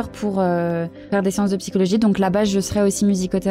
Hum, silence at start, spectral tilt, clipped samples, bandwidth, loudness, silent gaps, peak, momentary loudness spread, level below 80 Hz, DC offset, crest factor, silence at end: none; 0 s; -6 dB/octave; under 0.1%; 15.5 kHz; -20 LUFS; none; -6 dBFS; 6 LU; -46 dBFS; under 0.1%; 14 dB; 0 s